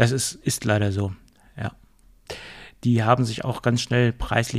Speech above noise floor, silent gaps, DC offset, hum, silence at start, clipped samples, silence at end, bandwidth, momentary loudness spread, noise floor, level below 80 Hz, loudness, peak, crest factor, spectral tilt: 32 dB; none; under 0.1%; none; 0 s; under 0.1%; 0 s; 14.5 kHz; 17 LU; -54 dBFS; -44 dBFS; -23 LUFS; -4 dBFS; 20 dB; -5 dB/octave